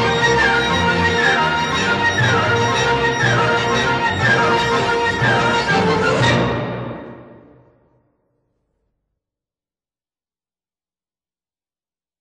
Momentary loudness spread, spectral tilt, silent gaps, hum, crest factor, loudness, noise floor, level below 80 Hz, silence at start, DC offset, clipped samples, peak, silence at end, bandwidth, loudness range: 3 LU; -4.5 dB/octave; none; none; 14 dB; -16 LUFS; under -90 dBFS; -42 dBFS; 0 s; under 0.1%; under 0.1%; -4 dBFS; 4.85 s; 11.5 kHz; 7 LU